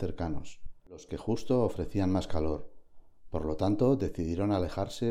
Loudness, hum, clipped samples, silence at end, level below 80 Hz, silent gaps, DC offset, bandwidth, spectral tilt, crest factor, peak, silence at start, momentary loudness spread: -31 LUFS; none; under 0.1%; 0 s; -46 dBFS; none; under 0.1%; 14 kHz; -7.5 dB/octave; 16 dB; -16 dBFS; 0 s; 14 LU